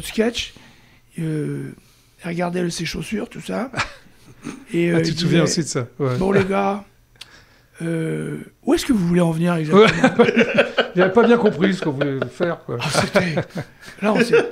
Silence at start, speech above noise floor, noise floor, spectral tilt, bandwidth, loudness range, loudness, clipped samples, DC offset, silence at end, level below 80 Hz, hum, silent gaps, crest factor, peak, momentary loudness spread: 0 s; 31 dB; -50 dBFS; -5.5 dB/octave; 15.5 kHz; 10 LU; -19 LUFS; under 0.1%; under 0.1%; 0 s; -48 dBFS; none; none; 18 dB; -2 dBFS; 15 LU